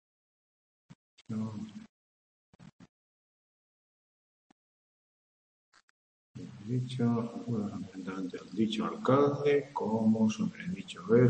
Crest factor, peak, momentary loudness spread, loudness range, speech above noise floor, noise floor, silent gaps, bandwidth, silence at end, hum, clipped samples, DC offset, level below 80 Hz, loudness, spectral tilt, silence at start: 22 dB; -12 dBFS; 16 LU; 16 LU; over 60 dB; under -90 dBFS; 1.89-2.59 s, 2.72-2.79 s, 2.89-5.72 s, 5.83-6.34 s; 8.6 kHz; 0 s; none; under 0.1%; under 0.1%; -74 dBFS; -32 LUFS; -7.5 dB/octave; 1.3 s